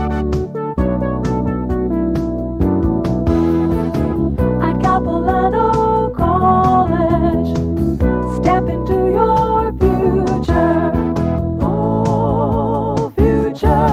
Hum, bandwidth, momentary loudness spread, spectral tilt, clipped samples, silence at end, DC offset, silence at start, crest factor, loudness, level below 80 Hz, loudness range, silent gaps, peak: none; 14.5 kHz; 5 LU; -9 dB/octave; under 0.1%; 0 s; under 0.1%; 0 s; 14 dB; -16 LUFS; -26 dBFS; 3 LU; none; 0 dBFS